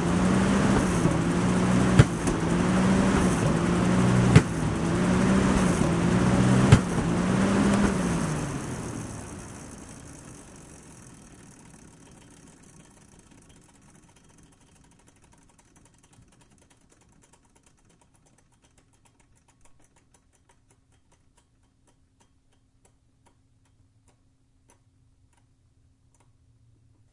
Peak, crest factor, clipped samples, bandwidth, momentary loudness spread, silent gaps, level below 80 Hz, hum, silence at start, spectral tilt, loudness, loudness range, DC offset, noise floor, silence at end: -4 dBFS; 24 dB; under 0.1%; 11.5 kHz; 24 LU; none; -42 dBFS; none; 0 s; -6.5 dB/octave; -23 LUFS; 21 LU; under 0.1%; -64 dBFS; 16.05 s